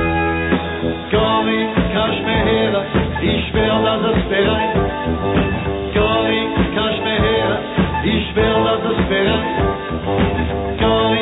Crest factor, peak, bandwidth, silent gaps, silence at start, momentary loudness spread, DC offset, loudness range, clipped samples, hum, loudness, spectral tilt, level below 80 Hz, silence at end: 14 dB; -2 dBFS; 4.1 kHz; none; 0 s; 4 LU; under 0.1%; 1 LU; under 0.1%; none; -17 LUFS; -9.5 dB/octave; -30 dBFS; 0 s